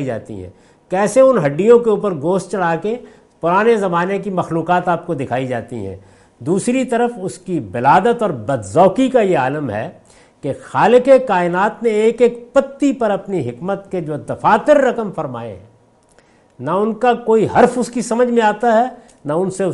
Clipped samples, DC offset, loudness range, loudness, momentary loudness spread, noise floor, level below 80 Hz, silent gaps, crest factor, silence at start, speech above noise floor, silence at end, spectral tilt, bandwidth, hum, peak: under 0.1%; under 0.1%; 4 LU; -16 LUFS; 14 LU; -52 dBFS; -54 dBFS; none; 16 dB; 0 s; 36 dB; 0 s; -6 dB/octave; 11.5 kHz; none; 0 dBFS